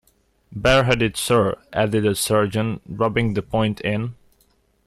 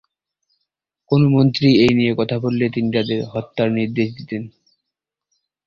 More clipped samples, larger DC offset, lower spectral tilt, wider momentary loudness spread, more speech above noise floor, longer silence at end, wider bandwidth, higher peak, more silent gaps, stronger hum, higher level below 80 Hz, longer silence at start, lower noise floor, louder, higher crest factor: neither; neither; second, -5 dB/octave vs -8 dB/octave; second, 8 LU vs 13 LU; second, 42 dB vs 66 dB; second, 0.75 s vs 1.2 s; first, 14 kHz vs 7.4 kHz; second, -6 dBFS vs -2 dBFS; neither; neither; first, -42 dBFS vs -52 dBFS; second, 0.5 s vs 1.1 s; second, -62 dBFS vs -83 dBFS; about the same, -20 LUFS vs -18 LUFS; about the same, 16 dB vs 18 dB